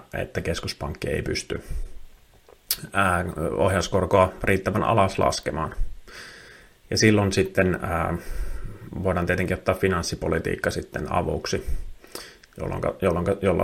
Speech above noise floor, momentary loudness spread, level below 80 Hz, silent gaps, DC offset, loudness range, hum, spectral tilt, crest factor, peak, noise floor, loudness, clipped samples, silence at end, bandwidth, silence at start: 30 dB; 18 LU; -38 dBFS; none; under 0.1%; 5 LU; none; -5 dB/octave; 22 dB; -2 dBFS; -53 dBFS; -24 LUFS; under 0.1%; 0 s; 16.5 kHz; 0.15 s